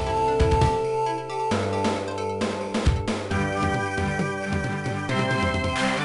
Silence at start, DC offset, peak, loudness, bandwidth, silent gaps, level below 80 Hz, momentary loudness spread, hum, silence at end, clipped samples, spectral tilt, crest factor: 0 s; under 0.1%; -8 dBFS; -25 LUFS; 11.5 kHz; none; -34 dBFS; 6 LU; none; 0 s; under 0.1%; -5.5 dB/octave; 16 dB